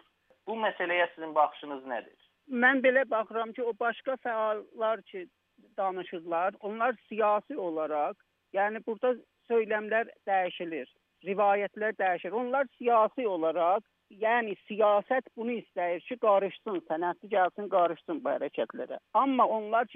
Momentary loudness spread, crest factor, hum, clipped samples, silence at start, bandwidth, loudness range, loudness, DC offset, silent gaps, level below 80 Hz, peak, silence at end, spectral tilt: 11 LU; 20 dB; none; under 0.1%; 0.45 s; 3.9 kHz; 4 LU; -30 LUFS; under 0.1%; none; -88 dBFS; -10 dBFS; 0 s; -7.5 dB/octave